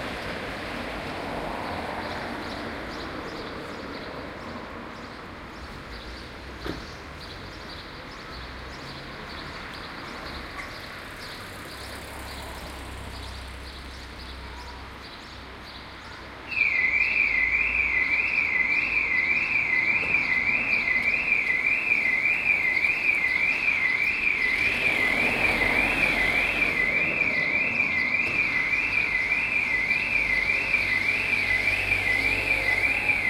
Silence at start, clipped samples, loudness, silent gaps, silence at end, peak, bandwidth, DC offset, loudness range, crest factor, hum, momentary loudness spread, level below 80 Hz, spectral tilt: 0 s; under 0.1%; -22 LUFS; none; 0 s; -10 dBFS; 16 kHz; under 0.1%; 17 LU; 16 dB; none; 18 LU; -46 dBFS; -3.5 dB/octave